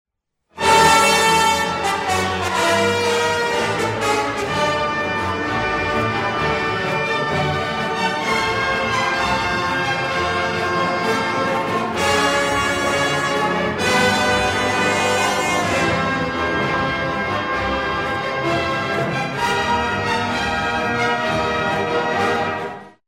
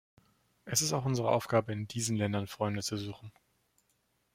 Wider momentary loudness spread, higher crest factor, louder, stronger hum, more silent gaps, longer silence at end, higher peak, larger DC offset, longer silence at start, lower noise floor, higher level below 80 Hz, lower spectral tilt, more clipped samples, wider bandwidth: second, 5 LU vs 9 LU; second, 16 dB vs 22 dB; first, -18 LUFS vs -32 LUFS; neither; neither; second, 0.2 s vs 1.05 s; first, -4 dBFS vs -12 dBFS; first, 0.1% vs under 0.1%; about the same, 0.55 s vs 0.65 s; second, -65 dBFS vs -76 dBFS; first, -42 dBFS vs -68 dBFS; about the same, -3.5 dB/octave vs -4.5 dB/octave; neither; about the same, 16.5 kHz vs 16 kHz